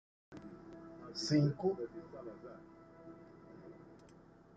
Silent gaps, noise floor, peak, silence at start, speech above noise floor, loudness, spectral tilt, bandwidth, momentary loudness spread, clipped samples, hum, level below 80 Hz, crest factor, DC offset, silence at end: none; -61 dBFS; -20 dBFS; 0.3 s; 25 dB; -37 LUFS; -6.5 dB/octave; 9 kHz; 25 LU; under 0.1%; none; -72 dBFS; 22 dB; under 0.1%; 0.45 s